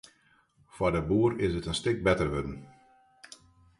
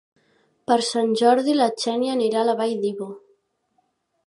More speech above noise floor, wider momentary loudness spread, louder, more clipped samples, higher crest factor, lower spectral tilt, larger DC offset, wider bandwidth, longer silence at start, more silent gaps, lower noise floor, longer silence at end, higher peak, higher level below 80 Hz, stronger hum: second, 38 dB vs 49 dB; first, 23 LU vs 11 LU; second, -29 LUFS vs -21 LUFS; neither; about the same, 18 dB vs 18 dB; first, -6 dB/octave vs -4 dB/octave; neither; about the same, 11.5 kHz vs 11.5 kHz; about the same, 0.75 s vs 0.7 s; neither; about the same, -66 dBFS vs -69 dBFS; second, 0.55 s vs 1.1 s; second, -12 dBFS vs -4 dBFS; first, -48 dBFS vs -76 dBFS; neither